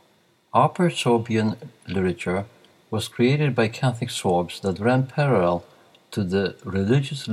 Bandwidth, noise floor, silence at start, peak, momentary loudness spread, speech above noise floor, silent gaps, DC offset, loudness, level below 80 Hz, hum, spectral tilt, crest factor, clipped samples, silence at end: 13.5 kHz; -61 dBFS; 0.55 s; -4 dBFS; 9 LU; 39 dB; none; under 0.1%; -23 LUFS; -60 dBFS; none; -6.5 dB/octave; 18 dB; under 0.1%; 0 s